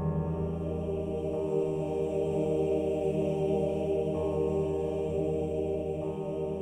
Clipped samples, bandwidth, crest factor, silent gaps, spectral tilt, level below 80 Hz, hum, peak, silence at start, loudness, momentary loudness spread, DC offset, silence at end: under 0.1%; 9.8 kHz; 12 dB; none; -9 dB/octave; -48 dBFS; none; -18 dBFS; 0 s; -31 LUFS; 4 LU; under 0.1%; 0 s